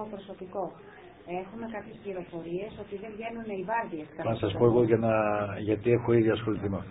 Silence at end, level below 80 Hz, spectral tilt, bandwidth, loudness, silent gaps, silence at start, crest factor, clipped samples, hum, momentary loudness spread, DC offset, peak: 0 s; -56 dBFS; -11.5 dB/octave; 4 kHz; -29 LUFS; none; 0 s; 20 dB; under 0.1%; none; 16 LU; under 0.1%; -10 dBFS